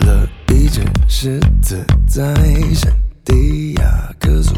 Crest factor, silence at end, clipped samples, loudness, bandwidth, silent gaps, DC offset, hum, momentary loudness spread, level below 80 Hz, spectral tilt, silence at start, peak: 10 dB; 0 s; under 0.1%; -15 LUFS; 15 kHz; none; under 0.1%; none; 3 LU; -14 dBFS; -6 dB/octave; 0 s; 0 dBFS